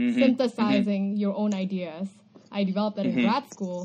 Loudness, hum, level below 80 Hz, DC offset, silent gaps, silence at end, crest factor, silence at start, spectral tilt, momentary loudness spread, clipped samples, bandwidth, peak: -26 LUFS; none; -72 dBFS; under 0.1%; none; 0 s; 16 dB; 0 s; -7 dB/octave; 12 LU; under 0.1%; 9 kHz; -10 dBFS